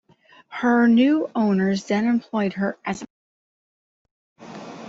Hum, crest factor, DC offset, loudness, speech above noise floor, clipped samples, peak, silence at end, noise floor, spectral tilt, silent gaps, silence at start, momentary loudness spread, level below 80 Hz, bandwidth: none; 14 dB; under 0.1%; -21 LUFS; 32 dB; under 0.1%; -8 dBFS; 0 s; -52 dBFS; -6.5 dB/octave; 3.10-4.05 s, 4.11-4.36 s; 0.5 s; 21 LU; -64 dBFS; 7.8 kHz